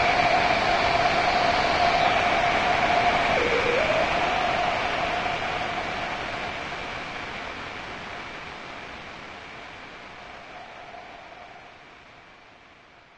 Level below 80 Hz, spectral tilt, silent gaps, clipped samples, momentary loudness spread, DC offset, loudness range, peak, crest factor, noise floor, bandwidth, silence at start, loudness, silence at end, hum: -46 dBFS; -3.5 dB/octave; none; under 0.1%; 20 LU; under 0.1%; 20 LU; -8 dBFS; 18 dB; -52 dBFS; 10 kHz; 0 s; -23 LUFS; 0.8 s; none